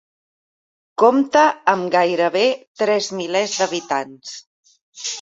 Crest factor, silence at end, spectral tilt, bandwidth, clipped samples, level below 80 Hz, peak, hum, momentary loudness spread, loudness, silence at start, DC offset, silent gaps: 20 dB; 0 s; -3 dB/octave; 8 kHz; under 0.1%; -68 dBFS; 0 dBFS; none; 17 LU; -18 LUFS; 1 s; under 0.1%; 2.67-2.75 s, 4.46-4.63 s, 4.81-4.93 s